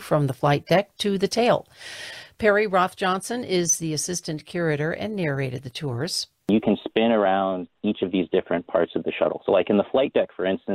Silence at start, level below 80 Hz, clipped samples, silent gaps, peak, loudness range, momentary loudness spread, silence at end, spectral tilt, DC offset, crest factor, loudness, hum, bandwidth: 0 s; -58 dBFS; under 0.1%; none; -8 dBFS; 3 LU; 8 LU; 0 s; -4.5 dB/octave; under 0.1%; 14 dB; -23 LUFS; none; 16 kHz